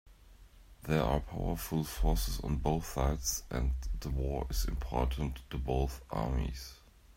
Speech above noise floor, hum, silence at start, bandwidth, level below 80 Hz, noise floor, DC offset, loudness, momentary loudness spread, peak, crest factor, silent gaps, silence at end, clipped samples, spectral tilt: 23 dB; none; 0.05 s; 16 kHz; -36 dBFS; -57 dBFS; under 0.1%; -35 LUFS; 6 LU; -14 dBFS; 20 dB; none; 0.05 s; under 0.1%; -5.5 dB/octave